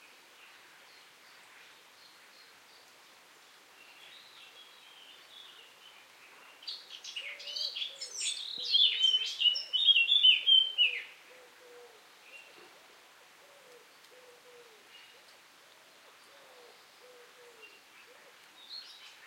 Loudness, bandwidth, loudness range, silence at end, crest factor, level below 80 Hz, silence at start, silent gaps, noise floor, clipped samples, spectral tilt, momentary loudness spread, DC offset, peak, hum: -26 LUFS; 16.5 kHz; 24 LU; 0.15 s; 22 dB; under -90 dBFS; 4.1 s; none; -59 dBFS; under 0.1%; 3.5 dB/octave; 30 LU; under 0.1%; -14 dBFS; none